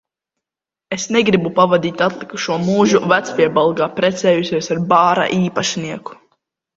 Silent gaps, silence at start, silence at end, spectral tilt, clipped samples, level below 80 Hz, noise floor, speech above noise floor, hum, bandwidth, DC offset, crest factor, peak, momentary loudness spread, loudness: none; 0.9 s; 0.65 s; -5 dB/octave; under 0.1%; -56 dBFS; -87 dBFS; 71 dB; none; 7.8 kHz; under 0.1%; 16 dB; 0 dBFS; 11 LU; -16 LUFS